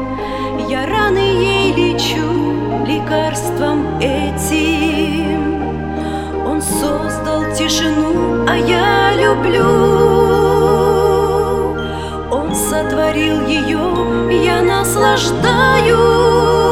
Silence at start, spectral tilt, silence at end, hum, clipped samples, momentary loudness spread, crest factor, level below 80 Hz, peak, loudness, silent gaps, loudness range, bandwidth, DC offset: 0 s; -5 dB/octave; 0 s; none; under 0.1%; 8 LU; 14 dB; -30 dBFS; 0 dBFS; -14 LUFS; none; 5 LU; 16.5 kHz; 0.1%